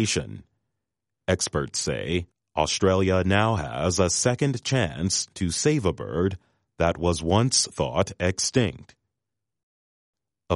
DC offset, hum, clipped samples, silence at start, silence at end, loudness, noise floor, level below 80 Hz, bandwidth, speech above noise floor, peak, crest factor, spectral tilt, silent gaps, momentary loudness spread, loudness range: under 0.1%; none; under 0.1%; 0 s; 0 s; -24 LUFS; -86 dBFS; -46 dBFS; 11.5 kHz; 62 dB; -6 dBFS; 20 dB; -4 dB/octave; 9.63-10.13 s; 7 LU; 3 LU